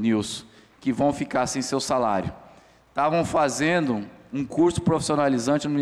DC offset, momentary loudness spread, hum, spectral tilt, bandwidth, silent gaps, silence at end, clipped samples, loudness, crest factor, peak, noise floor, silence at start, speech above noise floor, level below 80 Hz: under 0.1%; 10 LU; none; -5 dB/octave; 13.5 kHz; none; 0 s; under 0.1%; -24 LUFS; 12 dB; -12 dBFS; -53 dBFS; 0 s; 29 dB; -52 dBFS